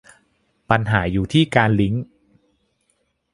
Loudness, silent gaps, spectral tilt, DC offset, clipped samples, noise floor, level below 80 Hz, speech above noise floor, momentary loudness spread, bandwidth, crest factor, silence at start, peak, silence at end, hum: -19 LUFS; none; -7 dB/octave; under 0.1%; under 0.1%; -68 dBFS; -42 dBFS; 51 dB; 8 LU; 11.5 kHz; 22 dB; 0.7 s; 0 dBFS; 1.3 s; none